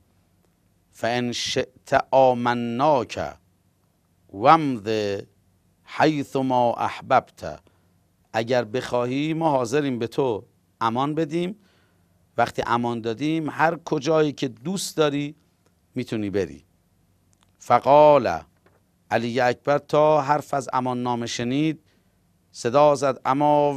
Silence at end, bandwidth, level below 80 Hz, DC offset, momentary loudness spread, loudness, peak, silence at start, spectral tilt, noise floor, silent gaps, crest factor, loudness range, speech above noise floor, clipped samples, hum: 0 s; 14.5 kHz; -60 dBFS; under 0.1%; 12 LU; -22 LUFS; -2 dBFS; 1 s; -5.5 dB/octave; -65 dBFS; none; 22 dB; 5 LU; 43 dB; under 0.1%; none